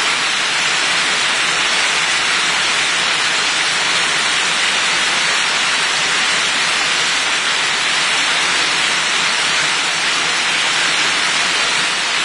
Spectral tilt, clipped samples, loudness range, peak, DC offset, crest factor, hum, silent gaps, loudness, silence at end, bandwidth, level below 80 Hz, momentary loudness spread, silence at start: 0.5 dB/octave; under 0.1%; 0 LU; -2 dBFS; under 0.1%; 14 dB; none; none; -13 LUFS; 0 s; 11 kHz; -54 dBFS; 1 LU; 0 s